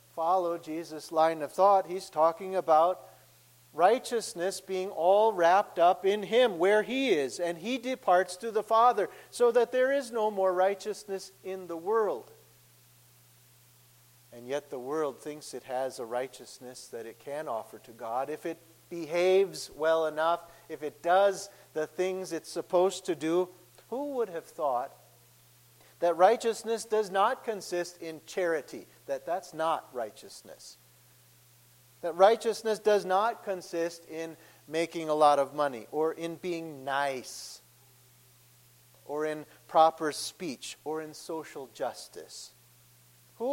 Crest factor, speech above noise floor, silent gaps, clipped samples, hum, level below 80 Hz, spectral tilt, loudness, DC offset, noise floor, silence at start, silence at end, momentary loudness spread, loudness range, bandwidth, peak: 22 dB; 31 dB; none; under 0.1%; 60 Hz at -70 dBFS; -78 dBFS; -4 dB/octave; -29 LUFS; under 0.1%; -60 dBFS; 0.15 s; 0 s; 17 LU; 10 LU; 16.5 kHz; -8 dBFS